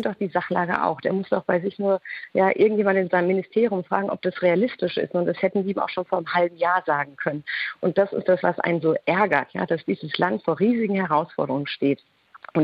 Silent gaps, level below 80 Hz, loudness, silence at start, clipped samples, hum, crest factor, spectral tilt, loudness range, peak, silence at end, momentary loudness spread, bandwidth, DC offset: none; -68 dBFS; -23 LUFS; 0 s; under 0.1%; none; 18 dB; -9 dB/octave; 2 LU; -6 dBFS; 0 s; 6 LU; 5.4 kHz; under 0.1%